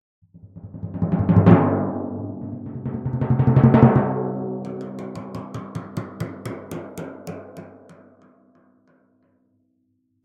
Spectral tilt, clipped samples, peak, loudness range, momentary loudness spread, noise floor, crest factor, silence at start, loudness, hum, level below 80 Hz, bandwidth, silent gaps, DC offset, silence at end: -10 dB/octave; under 0.1%; 0 dBFS; 20 LU; 21 LU; -68 dBFS; 22 dB; 0.35 s; -21 LUFS; none; -48 dBFS; 8.6 kHz; none; under 0.1%; 2.3 s